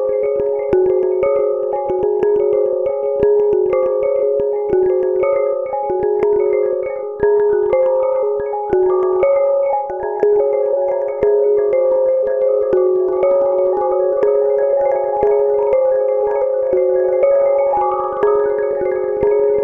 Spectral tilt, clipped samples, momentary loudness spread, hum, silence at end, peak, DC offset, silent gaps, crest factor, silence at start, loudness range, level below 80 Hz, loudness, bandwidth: -9.5 dB/octave; under 0.1%; 4 LU; none; 0 s; -2 dBFS; under 0.1%; none; 14 dB; 0 s; 1 LU; -48 dBFS; -16 LUFS; 3.1 kHz